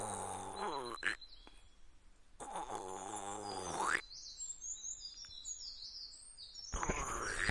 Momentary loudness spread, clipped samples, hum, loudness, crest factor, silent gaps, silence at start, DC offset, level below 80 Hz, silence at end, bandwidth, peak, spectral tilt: 12 LU; under 0.1%; none; -42 LUFS; 26 dB; none; 0 s; under 0.1%; -56 dBFS; 0 s; 12 kHz; -18 dBFS; -2 dB/octave